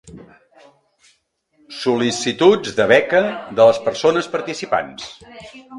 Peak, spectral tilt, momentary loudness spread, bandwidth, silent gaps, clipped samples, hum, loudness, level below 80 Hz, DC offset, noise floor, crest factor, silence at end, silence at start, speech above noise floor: 0 dBFS; -4 dB/octave; 21 LU; 11.5 kHz; none; under 0.1%; none; -17 LUFS; -58 dBFS; under 0.1%; -63 dBFS; 18 dB; 0 s; 0.05 s; 46 dB